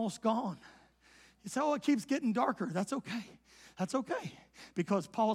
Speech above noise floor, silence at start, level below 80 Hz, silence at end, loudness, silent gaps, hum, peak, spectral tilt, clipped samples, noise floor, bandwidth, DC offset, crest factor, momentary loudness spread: 29 dB; 0 s; -76 dBFS; 0 s; -35 LUFS; none; none; -18 dBFS; -5.5 dB/octave; under 0.1%; -63 dBFS; 14.5 kHz; under 0.1%; 18 dB; 18 LU